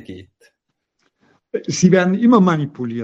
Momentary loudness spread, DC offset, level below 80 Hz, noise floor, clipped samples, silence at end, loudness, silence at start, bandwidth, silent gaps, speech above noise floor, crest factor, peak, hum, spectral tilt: 15 LU; under 0.1%; -58 dBFS; -73 dBFS; under 0.1%; 0 s; -15 LUFS; 0.1 s; 8 kHz; none; 57 dB; 18 dB; 0 dBFS; none; -6 dB/octave